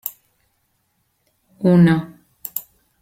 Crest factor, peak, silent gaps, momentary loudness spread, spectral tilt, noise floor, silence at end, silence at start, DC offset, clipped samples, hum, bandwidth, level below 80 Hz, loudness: 18 dB; -2 dBFS; none; 20 LU; -7.5 dB/octave; -68 dBFS; 0.4 s; 0.05 s; under 0.1%; under 0.1%; none; 16.5 kHz; -56 dBFS; -18 LUFS